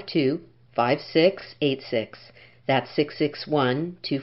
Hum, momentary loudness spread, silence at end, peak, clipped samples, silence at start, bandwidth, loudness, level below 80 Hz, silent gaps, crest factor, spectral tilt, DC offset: none; 9 LU; 0 s; -6 dBFS; under 0.1%; 0 s; 5.8 kHz; -25 LUFS; -66 dBFS; none; 18 dB; -9 dB/octave; 0.1%